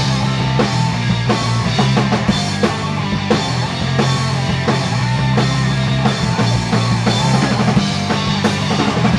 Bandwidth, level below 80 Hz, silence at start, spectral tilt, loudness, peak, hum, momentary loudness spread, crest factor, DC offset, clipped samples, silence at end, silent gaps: 11 kHz; -36 dBFS; 0 s; -5.5 dB/octave; -16 LUFS; -2 dBFS; none; 3 LU; 14 dB; under 0.1%; under 0.1%; 0 s; none